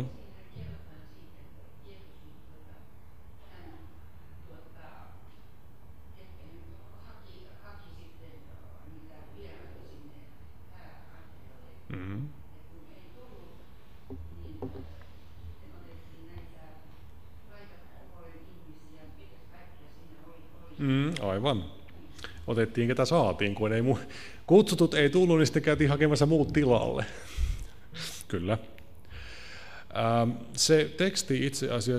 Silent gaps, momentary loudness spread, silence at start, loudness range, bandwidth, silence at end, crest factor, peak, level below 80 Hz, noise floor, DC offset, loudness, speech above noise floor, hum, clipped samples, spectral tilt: none; 28 LU; 0 s; 27 LU; 15.5 kHz; 0 s; 24 dB; -8 dBFS; -48 dBFS; -55 dBFS; 0.7%; -27 LUFS; 29 dB; none; under 0.1%; -5.5 dB/octave